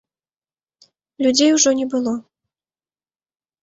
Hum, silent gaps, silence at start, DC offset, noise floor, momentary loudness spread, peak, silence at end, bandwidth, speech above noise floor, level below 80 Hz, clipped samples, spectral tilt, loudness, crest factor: none; none; 1.2 s; under 0.1%; under -90 dBFS; 11 LU; -2 dBFS; 1.4 s; 8.2 kHz; over 73 dB; -64 dBFS; under 0.1%; -1.5 dB/octave; -17 LUFS; 18 dB